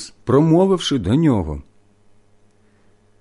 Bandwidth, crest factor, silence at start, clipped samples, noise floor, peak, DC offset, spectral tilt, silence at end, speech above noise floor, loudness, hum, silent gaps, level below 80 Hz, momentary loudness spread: 11.5 kHz; 16 dB; 0 s; under 0.1%; -54 dBFS; -4 dBFS; under 0.1%; -7 dB/octave; 1.6 s; 38 dB; -17 LUFS; none; none; -40 dBFS; 11 LU